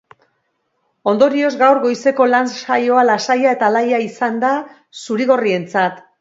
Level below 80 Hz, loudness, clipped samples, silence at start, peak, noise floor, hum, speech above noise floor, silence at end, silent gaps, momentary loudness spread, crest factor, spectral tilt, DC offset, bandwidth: -70 dBFS; -15 LUFS; under 0.1%; 1.05 s; 0 dBFS; -68 dBFS; none; 53 dB; 0.2 s; none; 8 LU; 16 dB; -5 dB/octave; under 0.1%; 7.8 kHz